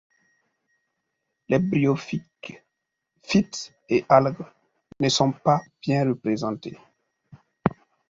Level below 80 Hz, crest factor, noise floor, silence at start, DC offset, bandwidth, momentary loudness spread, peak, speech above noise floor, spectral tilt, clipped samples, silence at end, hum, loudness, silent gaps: -58 dBFS; 24 dB; -81 dBFS; 1.5 s; under 0.1%; 7.8 kHz; 19 LU; -2 dBFS; 58 dB; -5.5 dB/octave; under 0.1%; 0.35 s; none; -24 LUFS; none